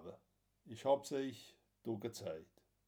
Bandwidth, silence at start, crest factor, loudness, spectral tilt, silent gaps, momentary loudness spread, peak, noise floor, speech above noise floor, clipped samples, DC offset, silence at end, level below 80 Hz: 19 kHz; 0 s; 22 dB; -42 LUFS; -5.5 dB/octave; none; 20 LU; -22 dBFS; -76 dBFS; 35 dB; under 0.1%; under 0.1%; 0.45 s; -84 dBFS